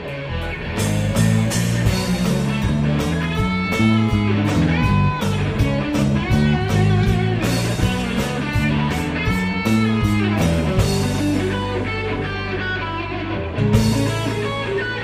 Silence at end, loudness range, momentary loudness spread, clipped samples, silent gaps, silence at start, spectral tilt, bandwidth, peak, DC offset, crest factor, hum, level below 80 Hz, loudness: 0 s; 3 LU; 6 LU; under 0.1%; none; 0 s; -6 dB/octave; 15.5 kHz; -2 dBFS; under 0.1%; 16 dB; none; -30 dBFS; -19 LUFS